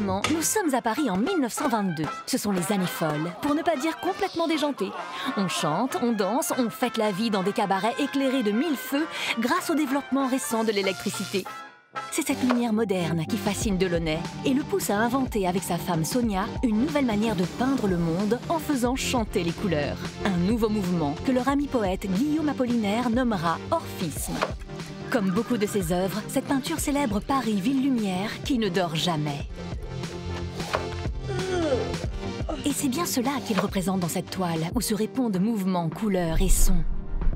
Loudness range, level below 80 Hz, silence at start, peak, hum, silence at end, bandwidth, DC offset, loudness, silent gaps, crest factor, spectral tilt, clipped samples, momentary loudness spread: 2 LU; -36 dBFS; 0 s; -8 dBFS; none; 0 s; 16 kHz; under 0.1%; -26 LUFS; none; 18 dB; -5 dB/octave; under 0.1%; 6 LU